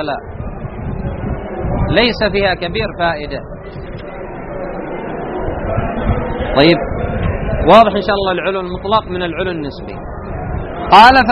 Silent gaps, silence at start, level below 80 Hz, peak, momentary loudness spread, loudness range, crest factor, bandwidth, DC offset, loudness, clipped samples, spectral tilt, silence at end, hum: none; 0 s; -28 dBFS; 0 dBFS; 19 LU; 9 LU; 14 dB; 12 kHz; under 0.1%; -15 LUFS; 0.3%; -7 dB/octave; 0 s; none